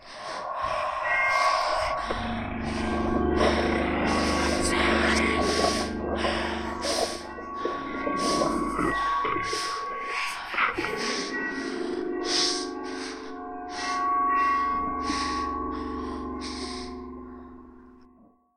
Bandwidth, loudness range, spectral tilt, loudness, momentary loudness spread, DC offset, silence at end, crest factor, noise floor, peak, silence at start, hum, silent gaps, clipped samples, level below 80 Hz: 15 kHz; 5 LU; -3.5 dB/octave; -27 LUFS; 12 LU; under 0.1%; 0.5 s; 18 dB; -58 dBFS; -10 dBFS; 0 s; none; none; under 0.1%; -44 dBFS